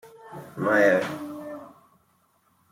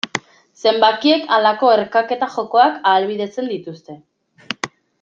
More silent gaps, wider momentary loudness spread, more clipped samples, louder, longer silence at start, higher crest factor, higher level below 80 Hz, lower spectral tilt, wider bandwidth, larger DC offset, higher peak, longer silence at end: neither; first, 23 LU vs 14 LU; neither; second, -23 LUFS vs -17 LUFS; about the same, 0.05 s vs 0.05 s; about the same, 20 dB vs 18 dB; second, -74 dBFS vs -68 dBFS; first, -6 dB/octave vs -3.5 dB/octave; first, 16 kHz vs 7.6 kHz; neither; second, -8 dBFS vs 0 dBFS; first, 1 s vs 0.35 s